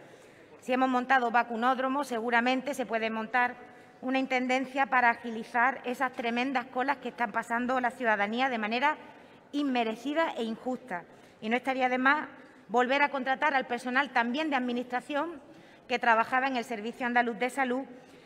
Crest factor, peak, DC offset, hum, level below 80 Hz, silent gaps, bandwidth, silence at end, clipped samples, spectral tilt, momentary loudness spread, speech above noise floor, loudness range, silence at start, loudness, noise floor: 20 dB; -8 dBFS; under 0.1%; none; -76 dBFS; none; 15 kHz; 0.1 s; under 0.1%; -4 dB/octave; 10 LU; 24 dB; 2 LU; 0 s; -29 LUFS; -54 dBFS